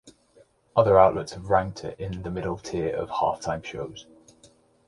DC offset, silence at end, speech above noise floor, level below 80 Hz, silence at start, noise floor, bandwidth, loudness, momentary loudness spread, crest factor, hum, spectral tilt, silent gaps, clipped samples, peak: under 0.1%; 0.85 s; 35 dB; -50 dBFS; 0.05 s; -59 dBFS; 11.5 kHz; -25 LUFS; 17 LU; 22 dB; none; -6 dB/octave; none; under 0.1%; -4 dBFS